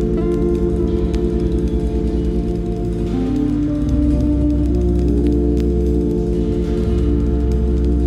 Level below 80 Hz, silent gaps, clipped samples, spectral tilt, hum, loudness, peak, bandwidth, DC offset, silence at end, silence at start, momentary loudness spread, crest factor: -20 dBFS; none; under 0.1%; -9.5 dB/octave; none; -18 LUFS; -4 dBFS; 7 kHz; under 0.1%; 0 s; 0 s; 3 LU; 12 dB